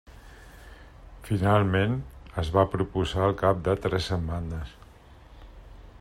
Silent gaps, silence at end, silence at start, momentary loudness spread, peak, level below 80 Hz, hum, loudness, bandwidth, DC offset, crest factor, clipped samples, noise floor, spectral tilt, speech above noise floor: none; 0.05 s; 0.1 s; 14 LU; -8 dBFS; -44 dBFS; none; -26 LUFS; 13 kHz; under 0.1%; 20 dB; under 0.1%; -50 dBFS; -7 dB/octave; 25 dB